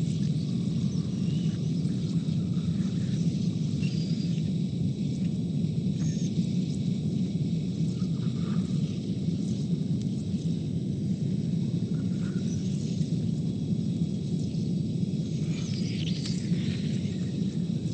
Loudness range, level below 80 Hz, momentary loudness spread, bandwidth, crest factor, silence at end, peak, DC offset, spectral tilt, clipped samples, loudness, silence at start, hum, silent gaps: 1 LU; -54 dBFS; 2 LU; 9 kHz; 14 dB; 0 s; -16 dBFS; under 0.1%; -7.5 dB/octave; under 0.1%; -29 LUFS; 0 s; none; none